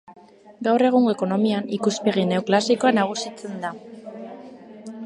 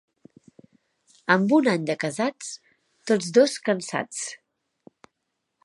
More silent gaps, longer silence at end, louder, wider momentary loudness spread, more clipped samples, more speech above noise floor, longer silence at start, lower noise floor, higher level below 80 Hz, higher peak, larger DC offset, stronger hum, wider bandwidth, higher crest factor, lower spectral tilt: neither; second, 0 s vs 1.3 s; about the same, -21 LUFS vs -23 LUFS; first, 21 LU vs 18 LU; neither; second, 21 dB vs 57 dB; second, 0.1 s vs 1.3 s; second, -42 dBFS vs -79 dBFS; about the same, -72 dBFS vs -76 dBFS; about the same, -4 dBFS vs -4 dBFS; neither; neither; about the same, 11 kHz vs 11.5 kHz; about the same, 18 dB vs 22 dB; about the same, -5.5 dB/octave vs -4.5 dB/octave